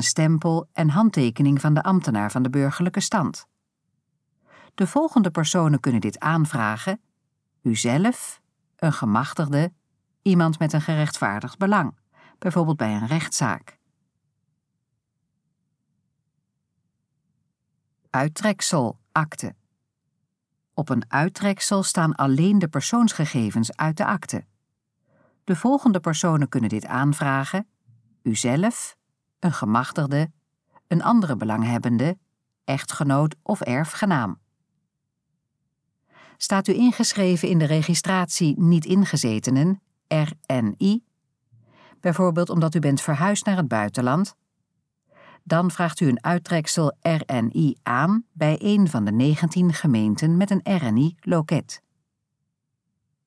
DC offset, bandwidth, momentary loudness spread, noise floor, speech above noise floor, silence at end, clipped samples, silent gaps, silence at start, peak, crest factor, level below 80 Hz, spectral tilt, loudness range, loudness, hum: under 0.1%; 11 kHz; 8 LU; -78 dBFS; 57 dB; 1.5 s; under 0.1%; none; 0 s; -6 dBFS; 16 dB; -72 dBFS; -5.5 dB/octave; 6 LU; -22 LUFS; none